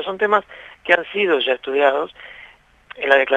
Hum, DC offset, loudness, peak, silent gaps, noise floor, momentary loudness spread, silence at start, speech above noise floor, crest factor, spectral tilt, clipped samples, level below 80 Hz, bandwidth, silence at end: none; under 0.1%; -18 LUFS; 0 dBFS; none; -47 dBFS; 18 LU; 0 s; 28 dB; 18 dB; -4.5 dB/octave; under 0.1%; -60 dBFS; 8.2 kHz; 0 s